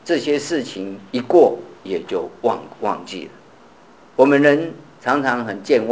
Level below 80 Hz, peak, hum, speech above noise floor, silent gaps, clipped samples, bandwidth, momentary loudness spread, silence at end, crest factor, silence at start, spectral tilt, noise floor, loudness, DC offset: -64 dBFS; 0 dBFS; none; 29 dB; none; under 0.1%; 8 kHz; 16 LU; 0 s; 18 dB; 0.05 s; -5.5 dB/octave; -47 dBFS; -19 LUFS; 0.2%